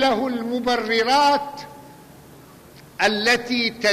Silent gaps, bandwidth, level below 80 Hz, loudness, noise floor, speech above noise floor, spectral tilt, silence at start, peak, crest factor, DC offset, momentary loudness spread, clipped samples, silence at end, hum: none; 15 kHz; -56 dBFS; -20 LUFS; -46 dBFS; 25 dB; -3 dB/octave; 0 s; -6 dBFS; 16 dB; under 0.1%; 18 LU; under 0.1%; 0 s; none